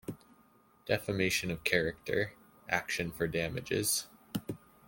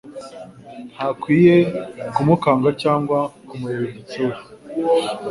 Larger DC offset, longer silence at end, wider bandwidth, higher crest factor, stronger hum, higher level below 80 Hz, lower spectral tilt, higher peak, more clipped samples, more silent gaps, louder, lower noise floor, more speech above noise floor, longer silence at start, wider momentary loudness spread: neither; first, 0.3 s vs 0 s; first, 17 kHz vs 11.5 kHz; first, 26 dB vs 18 dB; neither; about the same, -60 dBFS vs -56 dBFS; second, -3.5 dB/octave vs -7.5 dB/octave; second, -10 dBFS vs -2 dBFS; neither; neither; second, -33 LUFS vs -19 LUFS; first, -65 dBFS vs -38 dBFS; first, 32 dB vs 19 dB; about the same, 0.1 s vs 0.05 s; second, 15 LU vs 22 LU